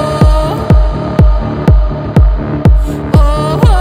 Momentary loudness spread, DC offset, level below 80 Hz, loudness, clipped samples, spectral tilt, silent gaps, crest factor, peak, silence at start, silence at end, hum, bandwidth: 3 LU; under 0.1%; -10 dBFS; -11 LUFS; under 0.1%; -8 dB/octave; none; 8 dB; 0 dBFS; 0 s; 0 s; none; 10 kHz